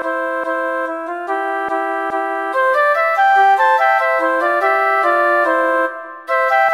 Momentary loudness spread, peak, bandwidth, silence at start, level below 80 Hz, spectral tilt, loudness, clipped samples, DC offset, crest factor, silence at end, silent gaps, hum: 9 LU; -2 dBFS; 16 kHz; 0 s; -70 dBFS; -2.5 dB/octave; -15 LUFS; under 0.1%; under 0.1%; 14 dB; 0 s; none; none